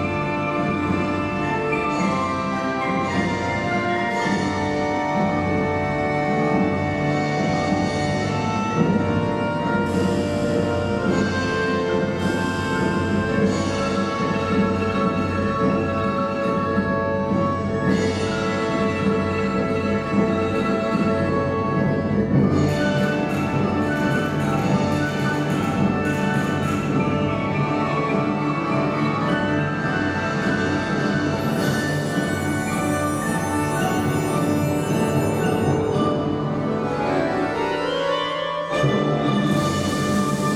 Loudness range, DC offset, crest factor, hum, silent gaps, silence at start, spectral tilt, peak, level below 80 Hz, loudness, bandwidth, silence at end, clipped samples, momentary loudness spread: 1 LU; under 0.1%; 16 dB; none; none; 0 s; -6.5 dB/octave; -6 dBFS; -46 dBFS; -22 LUFS; 16.5 kHz; 0 s; under 0.1%; 2 LU